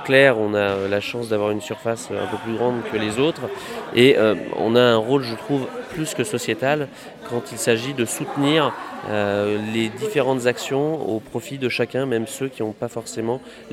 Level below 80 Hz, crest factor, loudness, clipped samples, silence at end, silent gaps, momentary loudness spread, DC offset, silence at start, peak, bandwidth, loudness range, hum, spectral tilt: -60 dBFS; 20 dB; -21 LUFS; under 0.1%; 0 s; none; 12 LU; under 0.1%; 0 s; 0 dBFS; 16 kHz; 4 LU; none; -4.5 dB/octave